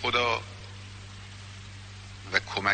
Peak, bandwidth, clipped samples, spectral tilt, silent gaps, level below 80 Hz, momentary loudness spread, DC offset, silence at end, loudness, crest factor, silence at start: -6 dBFS; 9 kHz; under 0.1%; -3.5 dB/octave; none; -54 dBFS; 18 LU; under 0.1%; 0 s; -28 LUFS; 26 dB; 0 s